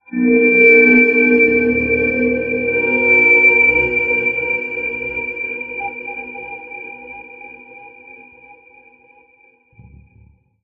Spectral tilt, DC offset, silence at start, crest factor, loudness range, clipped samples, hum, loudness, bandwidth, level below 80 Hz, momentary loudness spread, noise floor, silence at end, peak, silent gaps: -8 dB/octave; under 0.1%; 0.1 s; 16 dB; 20 LU; under 0.1%; none; -12 LUFS; 6.8 kHz; -46 dBFS; 21 LU; -53 dBFS; 2.75 s; 0 dBFS; none